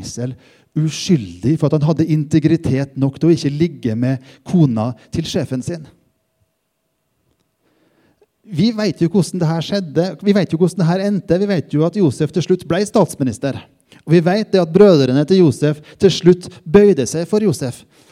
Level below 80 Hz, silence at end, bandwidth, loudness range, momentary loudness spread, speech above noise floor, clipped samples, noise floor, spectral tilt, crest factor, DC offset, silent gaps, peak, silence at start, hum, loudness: -50 dBFS; 0.35 s; 13.5 kHz; 10 LU; 12 LU; 54 dB; under 0.1%; -69 dBFS; -7 dB/octave; 16 dB; under 0.1%; none; 0 dBFS; 0 s; none; -16 LUFS